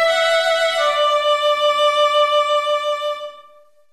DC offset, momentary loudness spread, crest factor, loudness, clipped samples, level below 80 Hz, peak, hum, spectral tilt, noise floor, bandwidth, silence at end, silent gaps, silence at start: under 0.1%; 8 LU; 12 dB; -16 LUFS; under 0.1%; -66 dBFS; -6 dBFS; none; 1.5 dB/octave; -50 dBFS; 14 kHz; 0.5 s; none; 0 s